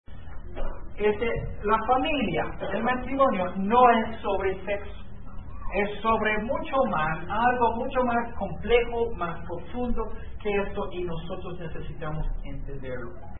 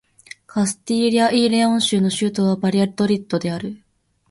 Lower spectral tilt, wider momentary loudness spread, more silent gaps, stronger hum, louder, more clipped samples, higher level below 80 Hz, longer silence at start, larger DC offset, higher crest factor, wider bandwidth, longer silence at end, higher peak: first, -10 dB/octave vs -5 dB/octave; first, 15 LU vs 9 LU; neither; neither; second, -27 LUFS vs -19 LUFS; neither; first, -38 dBFS vs -60 dBFS; second, 0.05 s vs 0.55 s; first, 2% vs under 0.1%; about the same, 20 dB vs 16 dB; second, 4.1 kHz vs 11.5 kHz; second, 0 s vs 0.55 s; about the same, -6 dBFS vs -4 dBFS